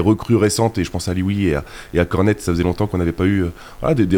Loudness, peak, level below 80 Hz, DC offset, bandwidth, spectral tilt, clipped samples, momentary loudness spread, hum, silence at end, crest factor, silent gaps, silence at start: -19 LUFS; -4 dBFS; -36 dBFS; under 0.1%; 18.5 kHz; -6.5 dB/octave; under 0.1%; 7 LU; none; 0 s; 14 dB; none; 0 s